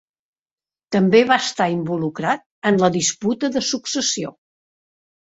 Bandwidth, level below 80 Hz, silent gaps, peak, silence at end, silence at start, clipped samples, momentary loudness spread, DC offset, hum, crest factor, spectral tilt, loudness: 8 kHz; -62 dBFS; 2.46-2.62 s; -2 dBFS; 0.9 s; 0.9 s; under 0.1%; 9 LU; under 0.1%; none; 20 dB; -4 dB/octave; -19 LUFS